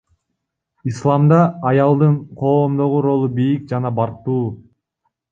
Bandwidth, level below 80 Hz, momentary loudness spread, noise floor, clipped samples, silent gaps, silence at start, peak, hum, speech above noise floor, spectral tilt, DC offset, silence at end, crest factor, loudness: 7.4 kHz; -56 dBFS; 8 LU; -76 dBFS; under 0.1%; none; 0.85 s; -2 dBFS; none; 60 dB; -9.5 dB/octave; under 0.1%; 0.7 s; 16 dB; -17 LUFS